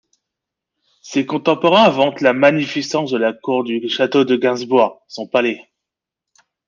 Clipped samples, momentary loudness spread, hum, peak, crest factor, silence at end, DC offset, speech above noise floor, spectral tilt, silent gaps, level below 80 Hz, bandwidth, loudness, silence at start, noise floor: under 0.1%; 9 LU; none; -2 dBFS; 16 dB; 1.1 s; under 0.1%; 67 dB; -5 dB/octave; none; -64 dBFS; 7.4 kHz; -16 LUFS; 1.05 s; -83 dBFS